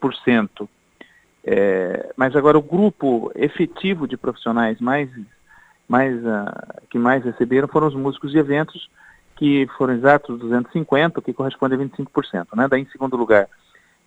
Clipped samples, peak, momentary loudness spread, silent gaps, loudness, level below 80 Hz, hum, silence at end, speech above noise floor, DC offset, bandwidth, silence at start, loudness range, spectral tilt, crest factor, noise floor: under 0.1%; 0 dBFS; 11 LU; none; -19 LUFS; -58 dBFS; none; 0.6 s; 33 dB; under 0.1%; 8.2 kHz; 0 s; 3 LU; -8 dB/octave; 20 dB; -52 dBFS